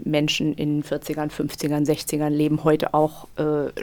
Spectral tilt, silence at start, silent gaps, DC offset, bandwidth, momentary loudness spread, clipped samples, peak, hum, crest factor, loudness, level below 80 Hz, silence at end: -5.5 dB/octave; 0 s; none; under 0.1%; 19 kHz; 7 LU; under 0.1%; -6 dBFS; none; 16 dB; -23 LUFS; -52 dBFS; 0 s